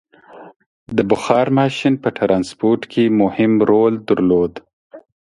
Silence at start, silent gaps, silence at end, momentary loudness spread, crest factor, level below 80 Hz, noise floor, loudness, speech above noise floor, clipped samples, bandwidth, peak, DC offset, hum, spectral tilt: 0.35 s; 0.56-0.60 s, 0.66-0.86 s, 4.73-4.90 s; 0.25 s; 5 LU; 16 dB; -52 dBFS; -41 dBFS; -16 LUFS; 26 dB; under 0.1%; 11.5 kHz; 0 dBFS; under 0.1%; none; -7 dB/octave